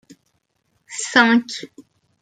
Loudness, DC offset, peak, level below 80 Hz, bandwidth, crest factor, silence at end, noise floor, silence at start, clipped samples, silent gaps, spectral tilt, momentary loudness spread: -17 LUFS; under 0.1%; -2 dBFS; -68 dBFS; 9.4 kHz; 20 dB; 0.4 s; -69 dBFS; 0.9 s; under 0.1%; none; -2.5 dB/octave; 19 LU